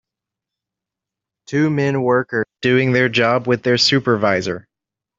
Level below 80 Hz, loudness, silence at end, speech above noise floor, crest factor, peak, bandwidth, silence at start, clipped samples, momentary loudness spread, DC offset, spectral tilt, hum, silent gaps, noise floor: -60 dBFS; -17 LUFS; 0.6 s; 69 dB; 16 dB; -2 dBFS; 8 kHz; 1.5 s; under 0.1%; 8 LU; under 0.1%; -5 dB/octave; none; none; -86 dBFS